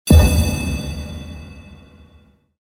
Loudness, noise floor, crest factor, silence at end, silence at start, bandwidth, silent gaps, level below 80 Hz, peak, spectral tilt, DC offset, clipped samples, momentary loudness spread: -18 LUFS; -52 dBFS; 18 dB; 0.95 s; 0.05 s; 16.5 kHz; none; -22 dBFS; 0 dBFS; -6 dB/octave; under 0.1%; under 0.1%; 25 LU